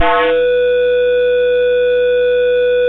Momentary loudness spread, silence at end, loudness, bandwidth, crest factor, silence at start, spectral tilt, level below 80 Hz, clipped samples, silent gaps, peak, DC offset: 0 LU; 0 s; -13 LUFS; 4 kHz; 10 dB; 0 s; -6 dB/octave; -40 dBFS; under 0.1%; none; -2 dBFS; under 0.1%